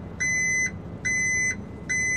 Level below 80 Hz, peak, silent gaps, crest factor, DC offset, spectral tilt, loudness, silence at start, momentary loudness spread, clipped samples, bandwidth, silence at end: -48 dBFS; -16 dBFS; none; 10 dB; 0.2%; -2.5 dB/octave; -24 LUFS; 0 s; 7 LU; under 0.1%; 13 kHz; 0 s